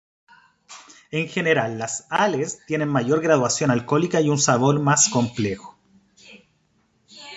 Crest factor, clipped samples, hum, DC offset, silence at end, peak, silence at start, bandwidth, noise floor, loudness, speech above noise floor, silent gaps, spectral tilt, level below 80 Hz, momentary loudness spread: 20 dB; under 0.1%; none; under 0.1%; 0 s; -4 dBFS; 0.7 s; 8.4 kHz; -65 dBFS; -21 LUFS; 44 dB; none; -4 dB/octave; -60 dBFS; 10 LU